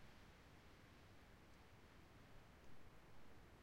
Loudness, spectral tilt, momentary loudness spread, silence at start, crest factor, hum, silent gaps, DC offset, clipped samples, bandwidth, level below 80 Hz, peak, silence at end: -67 LUFS; -5 dB/octave; 1 LU; 0 s; 14 dB; none; none; under 0.1%; under 0.1%; 16 kHz; -72 dBFS; -48 dBFS; 0 s